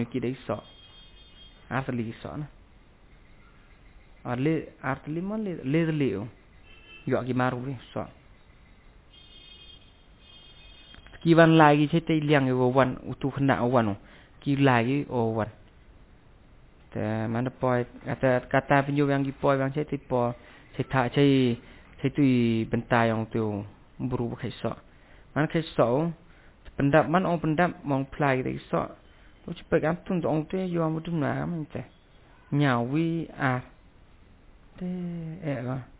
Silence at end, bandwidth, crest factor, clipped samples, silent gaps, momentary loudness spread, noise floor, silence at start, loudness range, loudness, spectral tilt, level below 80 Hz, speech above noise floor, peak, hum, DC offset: 0.15 s; 4 kHz; 22 dB; under 0.1%; none; 15 LU; -55 dBFS; 0 s; 11 LU; -26 LUFS; -6 dB/octave; -54 dBFS; 29 dB; -4 dBFS; none; under 0.1%